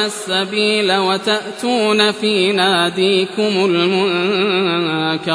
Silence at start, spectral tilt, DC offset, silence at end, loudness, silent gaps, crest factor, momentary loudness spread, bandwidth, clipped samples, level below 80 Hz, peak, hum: 0 s; -4 dB/octave; under 0.1%; 0 s; -15 LUFS; none; 14 dB; 4 LU; 11 kHz; under 0.1%; -64 dBFS; -2 dBFS; none